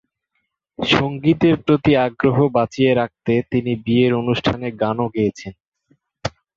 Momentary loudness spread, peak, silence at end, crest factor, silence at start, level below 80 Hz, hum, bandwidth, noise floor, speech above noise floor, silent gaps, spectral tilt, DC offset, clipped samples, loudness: 9 LU; -2 dBFS; 0.25 s; 16 dB; 0.8 s; -48 dBFS; none; 7.6 kHz; -73 dBFS; 55 dB; 5.68-5.72 s; -7 dB/octave; under 0.1%; under 0.1%; -18 LUFS